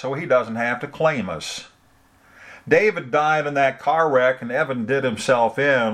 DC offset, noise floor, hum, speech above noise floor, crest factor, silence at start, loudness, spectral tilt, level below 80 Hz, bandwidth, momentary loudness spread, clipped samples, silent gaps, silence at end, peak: under 0.1%; -56 dBFS; none; 36 dB; 18 dB; 0 s; -20 LUFS; -5 dB/octave; -62 dBFS; 13.5 kHz; 9 LU; under 0.1%; none; 0 s; -2 dBFS